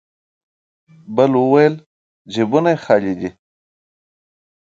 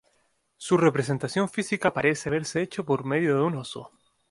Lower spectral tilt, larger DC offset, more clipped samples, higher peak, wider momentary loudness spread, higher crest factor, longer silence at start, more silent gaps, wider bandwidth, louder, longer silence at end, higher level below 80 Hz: first, -7.5 dB/octave vs -5.5 dB/octave; neither; neither; first, 0 dBFS vs -8 dBFS; first, 14 LU vs 10 LU; about the same, 18 dB vs 20 dB; first, 1.1 s vs 0.6 s; first, 1.86-2.25 s vs none; second, 7.6 kHz vs 11.5 kHz; first, -16 LUFS vs -25 LUFS; first, 1.35 s vs 0.45 s; about the same, -60 dBFS vs -64 dBFS